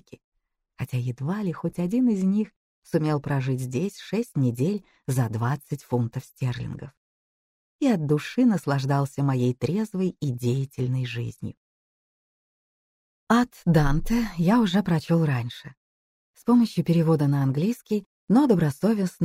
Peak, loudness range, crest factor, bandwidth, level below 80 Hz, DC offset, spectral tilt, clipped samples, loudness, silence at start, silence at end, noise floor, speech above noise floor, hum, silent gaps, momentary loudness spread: -8 dBFS; 6 LU; 18 dB; 16 kHz; -44 dBFS; under 0.1%; -7.5 dB/octave; under 0.1%; -25 LUFS; 0.1 s; 0 s; under -90 dBFS; over 66 dB; none; 0.24-0.32 s, 2.56-2.82 s, 6.97-7.79 s, 11.57-13.27 s, 15.77-16.34 s, 18.06-18.27 s; 10 LU